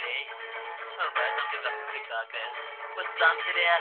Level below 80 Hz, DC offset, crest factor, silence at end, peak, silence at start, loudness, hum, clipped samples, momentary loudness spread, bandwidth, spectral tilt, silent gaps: under -90 dBFS; under 0.1%; 20 dB; 0 s; -10 dBFS; 0 s; -29 LUFS; none; under 0.1%; 13 LU; 4.5 kHz; -1.5 dB/octave; none